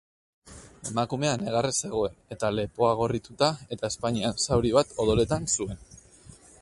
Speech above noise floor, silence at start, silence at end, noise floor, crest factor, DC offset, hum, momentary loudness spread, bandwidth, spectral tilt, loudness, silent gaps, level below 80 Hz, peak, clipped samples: 25 dB; 0.45 s; 0.25 s; -52 dBFS; 20 dB; under 0.1%; none; 9 LU; 11.5 kHz; -4.5 dB/octave; -27 LUFS; none; -48 dBFS; -6 dBFS; under 0.1%